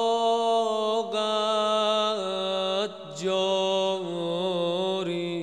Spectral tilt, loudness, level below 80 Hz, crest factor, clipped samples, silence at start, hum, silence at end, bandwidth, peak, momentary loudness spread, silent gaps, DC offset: -4 dB/octave; -26 LUFS; -74 dBFS; 14 dB; under 0.1%; 0 s; none; 0 s; 11 kHz; -12 dBFS; 6 LU; none; under 0.1%